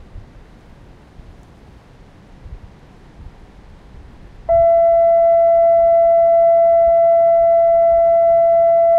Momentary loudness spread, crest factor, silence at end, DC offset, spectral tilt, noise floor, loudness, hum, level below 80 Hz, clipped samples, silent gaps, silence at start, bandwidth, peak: 1 LU; 8 dB; 0 s; under 0.1%; -8 dB/octave; -43 dBFS; -12 LUFS; none; -42 dBFS; under 0.1%; none; 0.15 s; 2.4 kHz; -6 dBFS